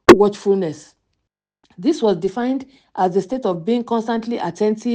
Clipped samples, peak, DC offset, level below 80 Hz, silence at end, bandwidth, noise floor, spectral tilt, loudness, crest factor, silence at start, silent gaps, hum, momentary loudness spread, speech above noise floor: 0.4%; 0 dBFS; under 0.1%; -48 dBFS; 0 s; 10 kHz; -76 dBFS; -6 dB/octave; -19 LUFS; 18 dB; 0.1 s; none; none; 9 LU; 57 dB